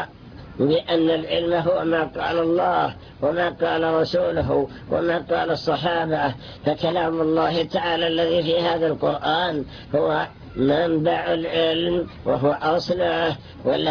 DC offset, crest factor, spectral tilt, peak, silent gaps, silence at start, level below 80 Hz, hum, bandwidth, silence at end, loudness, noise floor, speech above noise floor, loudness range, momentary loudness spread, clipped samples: under 0.1%; 14 dB; -7 dB/octave; -8 dBFS; none; 0 s; -48 dBFS; none; 5.4 kHz; 0 s; -22 LUFS; -41 dBFS; 19 dB; 1 LU; 5 LU; under 0.1%